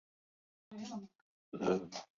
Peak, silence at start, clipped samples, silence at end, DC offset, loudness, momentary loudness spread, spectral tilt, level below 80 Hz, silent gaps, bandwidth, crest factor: -20 dBFS; 0.7 s; under 0.1%; 0.15 s; under 0.1%; -40 LUFS; 18 LU; -5.5 dB/octave; -76 dBFS; 1.15-1.52 s; 7.4 kHz; 22 dB